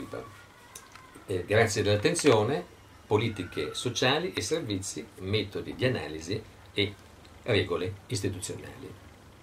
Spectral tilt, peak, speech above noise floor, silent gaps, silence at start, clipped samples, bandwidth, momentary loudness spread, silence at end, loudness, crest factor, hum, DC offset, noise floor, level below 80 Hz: -4.5 dB/octave; -10 dBFS; 21 dB; none; 0 s; under 0.1%; 15.5 kHz; 22 LU; 0.15 s; -29 LUFS; 22 dB; none; under 0.1%; -50 dBFS; -58 dBFS